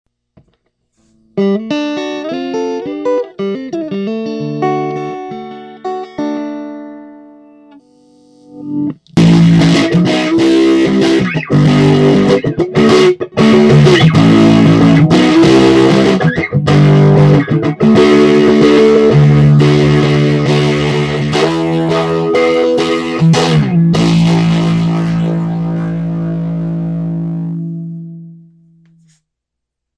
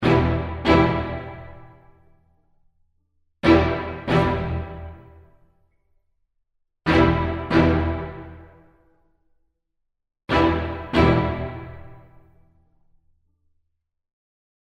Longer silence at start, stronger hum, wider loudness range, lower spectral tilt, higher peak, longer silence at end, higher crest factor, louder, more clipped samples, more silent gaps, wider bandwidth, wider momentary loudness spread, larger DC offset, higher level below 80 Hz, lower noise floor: first, 1.35 s vs 0 s; neither; first, 13 LU vs 4 LU; about the same, -7 dB/octave vs -8 dB/octave; first, 0 dBFS vs -4 dBFS; second, 1.65 s vs 2.65 s; second, 10 dB vs 20 dB; first, -10 LUFS vs -21 LUFS; neither; neither; first, 11 kHz vs 8.4 kHz; second, 13 LU vs 20 LU; neither; about the same, -38 dBFS vs -38 dBFS; about the same, -77 dBFS vs -77 dBFS